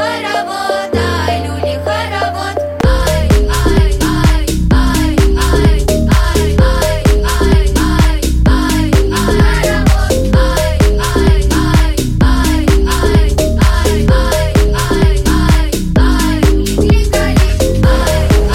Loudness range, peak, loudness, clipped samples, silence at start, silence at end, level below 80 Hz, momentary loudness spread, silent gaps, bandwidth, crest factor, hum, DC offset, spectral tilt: 2 LU; 0 dBFS; -12 LUFS; under 0.1%; 0 s; 0 s; -12 dBFS; 4 LU; none; 16 kHz; 10 dB; none; under 0.1%; -5.5 dB/octave